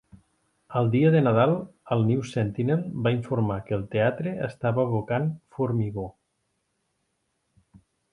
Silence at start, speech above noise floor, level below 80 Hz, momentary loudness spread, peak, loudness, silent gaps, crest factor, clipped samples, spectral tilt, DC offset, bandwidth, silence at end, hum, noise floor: 0.7 s; 51 dB; -56 dBFS; 10 LU; -8 dBFS; -25 LUFS; none; 18 dB; under 0.1%; -8.5 dB/octave; under 0.1%; 10.5 kHz; 2 s; none; -75 dBFS